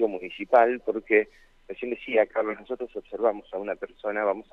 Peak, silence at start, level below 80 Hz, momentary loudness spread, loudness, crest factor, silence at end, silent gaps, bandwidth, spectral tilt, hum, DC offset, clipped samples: -6 dBFS; 0 s; -60 dBFS; 14 LU; -26 LUFS; 20 dB; 0.1 s; none; 5.4 kHz; -6.5 dB/octave; none; under 0.1%; under 0.1%